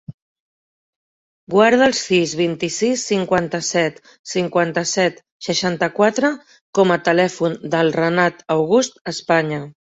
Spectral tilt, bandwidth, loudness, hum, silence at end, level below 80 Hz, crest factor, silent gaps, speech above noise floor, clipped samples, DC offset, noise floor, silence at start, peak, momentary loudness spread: -4 dB/octave; 8.2 kHz; -18 LUFS; none; 0.2 s; -60 dBFS; 18 dB; 0.14-1.47 s, 4.19-4.24 s, 5.31-5.40 s, 6.61-6.73 s, 9.01-9.05 s; over 72 dB; under 0.1%; under 0.1%; under -90 dBFS; 0.1 s; -2 dBFS; 9 LU